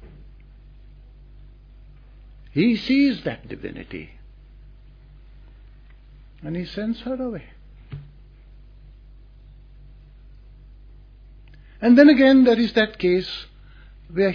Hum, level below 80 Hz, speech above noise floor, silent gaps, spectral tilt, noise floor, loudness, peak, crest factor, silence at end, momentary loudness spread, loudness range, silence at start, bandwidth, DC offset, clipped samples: none; -46 dBFS; 28 dB; none; -7.5 dB/octave; -46 dBFS; -19 LUFS; -2 dBFS; 22 dB; 0 s; 27 LU; 19 LU; 0 s; 5.4 kHz; under 0.1%; under 0.1%